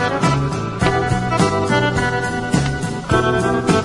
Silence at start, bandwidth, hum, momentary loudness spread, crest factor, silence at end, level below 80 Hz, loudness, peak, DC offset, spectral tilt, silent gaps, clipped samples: 0 s; 11.5 kHz; none; 4 LU; 16 dB; 0 s; -36 dBFS; -18 LUFS; 0 dBFS; under 0.1%; -5.5 dB/octave; none; under 0.1%